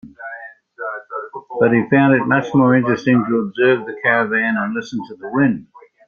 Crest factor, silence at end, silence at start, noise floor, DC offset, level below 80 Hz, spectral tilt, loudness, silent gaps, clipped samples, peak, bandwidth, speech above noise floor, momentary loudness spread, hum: 16 dB; 0.45 s; 0.05 s; -36 dBFS; under 0.1%; -58 dBFS; -8 dB/octave; -16 LUFS; none; under 0.1%; -2 dBFS; 7 kHz; 20 dB; 16 LU; none